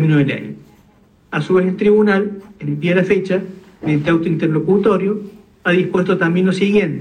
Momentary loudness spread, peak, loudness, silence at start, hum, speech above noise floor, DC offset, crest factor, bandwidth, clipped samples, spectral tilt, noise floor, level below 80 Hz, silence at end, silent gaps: 12 LU; -4 dBFS; -16 LUFS; 0 s; none; 36 dB; under 0.1%; 12 dB; 9.6 kHz; under 0.1%; -8 dB/octave; -51 dBFS; -52 dBFS; 0 s; none